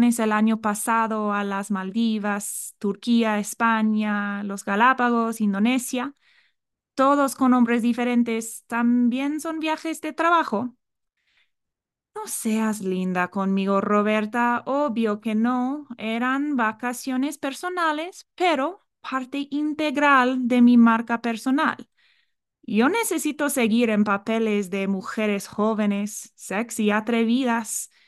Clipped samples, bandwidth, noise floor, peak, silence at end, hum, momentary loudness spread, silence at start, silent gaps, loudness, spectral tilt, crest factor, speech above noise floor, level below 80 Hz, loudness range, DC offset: under 0.1%; 12.5 kHz; -85 dBFS; -6 dBFS; 0.2 s; none; 10 LU; 0 s; none; -23 LUFS; -4.5 dB/octave; 18 dB; 63 dB; -74 dBFS; 5 LU; under 0.1%